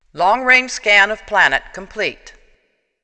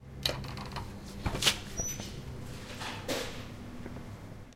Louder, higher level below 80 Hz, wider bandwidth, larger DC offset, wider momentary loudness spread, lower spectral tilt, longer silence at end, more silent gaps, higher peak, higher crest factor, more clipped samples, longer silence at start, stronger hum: first, -14 LUFS vs -36 LUFS; about the same, -46 dBFS vs -48 dBFS; second, 9.2 kHz vs 16.5 kHz; neither; second, 11 LU vs 16 LU; about the same, -1.5 dB/octave vs -2.5 dB/octave; first, 0.75 s vs 0 s; neither; first, 0 dBFS vs -10 dBFS; second, 18 dB vs 28 dB; neither; first, 0.15 s vs 0 s; neither